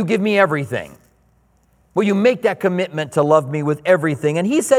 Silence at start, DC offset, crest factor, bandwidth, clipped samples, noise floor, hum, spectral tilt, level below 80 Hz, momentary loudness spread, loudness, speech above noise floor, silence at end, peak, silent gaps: 0 s; under 0.1%; 18 dB; 16 kHz; under 0.1%; -58 dBFS; none; -6 dB/octave; -60 dBFS; 8 LU; -18 LUFS; 41 dB; 0 s; 0 dBFS; none